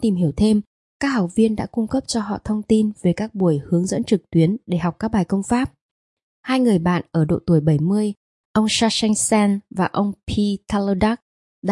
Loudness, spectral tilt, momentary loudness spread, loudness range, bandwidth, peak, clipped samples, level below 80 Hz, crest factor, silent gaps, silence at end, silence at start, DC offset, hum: -20 LUFS; -5.5 dB/octave; 6 LU; 2 LU; 11.5 kHz; -4 dBFS; under 0.1%; -46 dBFS; 16 dB; 0.67-1.00 s, 5.81-6.17 s, 6.23-6.43 s, 8.17-8.54 s, 11.22-11.62 s; 0 s; 0 s; under 0.1%; none